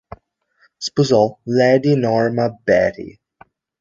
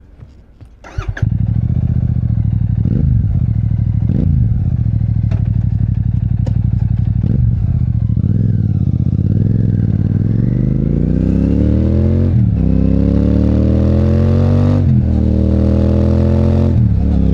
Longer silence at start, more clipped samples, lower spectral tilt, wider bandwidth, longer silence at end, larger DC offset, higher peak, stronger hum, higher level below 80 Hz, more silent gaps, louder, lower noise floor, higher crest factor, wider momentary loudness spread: first, 0.8 s vs 0.6 s; neither; second, -6 dB/octave vs -11 dB/octave; first, 7.8 kHz vs 5.4 kHz; first, 0.7 s vs 0 s; neither; about the same, -2 dBFS vs -2 dBFS; neither; second, -52 dBFS vs -20 dBFS; neither; second, -17 LUFS vs -14 LUFS; first, -60 dBFS vs -39 dBFS; first, 16 dB vs 10 dB; first, 12 LU vs 3 LU